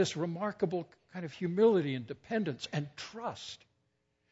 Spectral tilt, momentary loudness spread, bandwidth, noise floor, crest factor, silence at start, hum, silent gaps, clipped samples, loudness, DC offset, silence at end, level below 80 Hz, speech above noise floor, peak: -6 dB/octave; 17 LU; 8 kHz; -78 dBFS; 18 dB; 0 s; none; none; under 0.1%; -34 LUFS; under 0.1%; 0.75 s; -74 dBFS; 45 dB; -16 dBFS